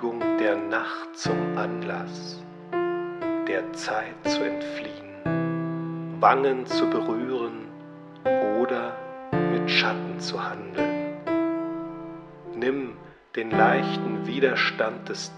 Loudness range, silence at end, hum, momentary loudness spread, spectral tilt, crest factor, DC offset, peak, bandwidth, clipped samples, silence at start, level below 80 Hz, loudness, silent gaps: 4 LU; 0 s; none; 15 LU; -5.5 dB/octave; 24 dB; under 0.1%; -2 dBFS; 9.8 kHz; under 0.1%; 0 s; -64 dBFS; -26 LUFS; none